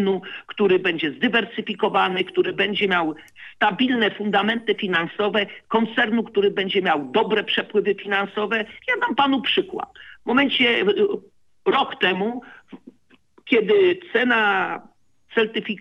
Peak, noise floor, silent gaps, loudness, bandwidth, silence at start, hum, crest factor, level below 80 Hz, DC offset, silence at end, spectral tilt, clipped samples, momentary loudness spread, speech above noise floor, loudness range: -4 dBFS; -57 dBFS; none; -21 LUFS; 7 kHz; 0 s; none; 18 dB; -68 dBFS; under 0.1%; 0.05 s; -6.5 dB/octave; under 0.1%; 9 LU; 36 dB; 1 LU